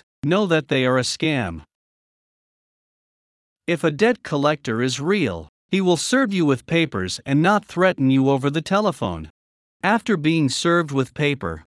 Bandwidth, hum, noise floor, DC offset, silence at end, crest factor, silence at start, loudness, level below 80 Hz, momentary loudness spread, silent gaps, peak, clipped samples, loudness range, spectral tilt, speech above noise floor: 12 kHz; none; under -90 dBFS; under 0.1%; 0.15 s; 18 dB; 0.25 s; -20 LUFS; -56 dBFS; 8 LU; 1.75-3.56 s, 5.49-5.69 s, 9.30-9.80 s; -4 dBFS; under 0.1%; 6 LU; -5.5 dB/octave; over 70 dB